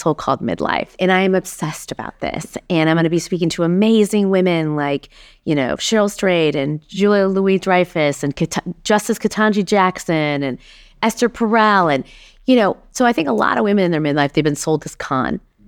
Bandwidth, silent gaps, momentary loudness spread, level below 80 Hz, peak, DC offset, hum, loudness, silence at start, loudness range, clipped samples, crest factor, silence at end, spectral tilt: 18 kHz; none; 10 LU; -48 dBFS; -2 dBFS; under 0.1%; none; -17 LUFS; 0 s; 2 LU; under 0.1%; 14 dB; 0.3 s; -5.5 dB/octave